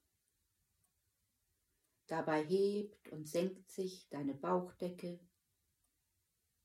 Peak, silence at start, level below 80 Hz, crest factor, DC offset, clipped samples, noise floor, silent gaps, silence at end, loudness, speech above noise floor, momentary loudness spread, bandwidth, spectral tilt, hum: -24 dBFS; 2.1 s; -84 dBFS; 18 dB; under 0.1%; under 0.1%; -84 dBFS; none; 1.45 s; -40 LUFS; 44 dB; 14 LU; 15.5 kHz; -6 dB/octave; none